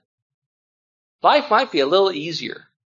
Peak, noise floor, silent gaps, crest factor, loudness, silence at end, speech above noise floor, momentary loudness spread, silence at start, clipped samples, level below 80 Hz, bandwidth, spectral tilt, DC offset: -2 dBFS; under -90 dBFS; none; 20 dB; -18 LUFS; 0.3 s; over 72 dB; 11 LU; 1.25 s; under 0.1%; -76 dBFS; 7.4 kHz; -4.5 dB/octave; under 0.1%